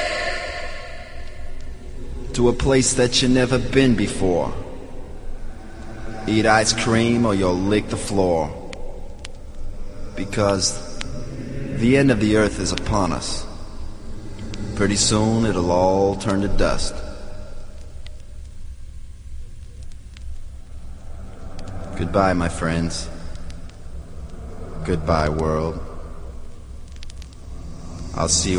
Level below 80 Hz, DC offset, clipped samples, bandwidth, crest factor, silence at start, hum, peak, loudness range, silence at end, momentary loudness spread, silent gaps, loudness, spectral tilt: -32 dBFS; 0.1%; under 0.1%; 11 kHz; 22 dB; 0 s; none; 0 dBFS; 11 LU; 0 s; 23 LU; none; -20 LUFS; -4.5 dB/octave